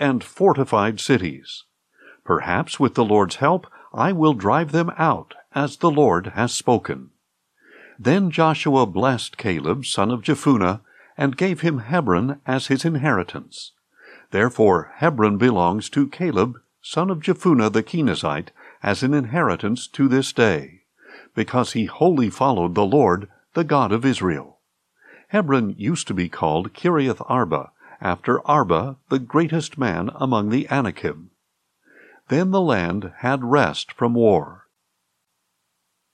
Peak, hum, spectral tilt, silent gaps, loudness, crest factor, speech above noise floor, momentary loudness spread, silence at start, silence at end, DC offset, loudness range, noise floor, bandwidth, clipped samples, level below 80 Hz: -4 dBFS; none; -6 dB/octave; none; -20 LUFS; 18 dB; 54 dB; 9 LU; 0 s; 1.6 s; under 0.1%; 3 LU; -74 dBFS; 12.5 kHz; under 0.1%; -60 dBFS